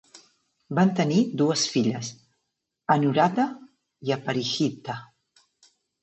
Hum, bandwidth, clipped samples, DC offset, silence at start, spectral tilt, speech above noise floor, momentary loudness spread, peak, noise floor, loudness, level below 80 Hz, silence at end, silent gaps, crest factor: none; 8.4 kHz; under 0.1%; under 0.1%; 0.15 s; -5 dB/octave; 57 dB; 14 LU; -6 dBFS; -80 dBFS; -24 LUFS; -74 dBFS; 1 s; none; 20 dB